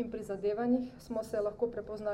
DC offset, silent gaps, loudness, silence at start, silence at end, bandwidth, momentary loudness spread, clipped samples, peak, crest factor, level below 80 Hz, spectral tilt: under 0.1%; none; -35 LUFS; 0 s; 0 s; 15.5 kHz; 7 LU; under 0.1%; -18 dBFS; 16 dB; -60 dBFS; -7 dB/octave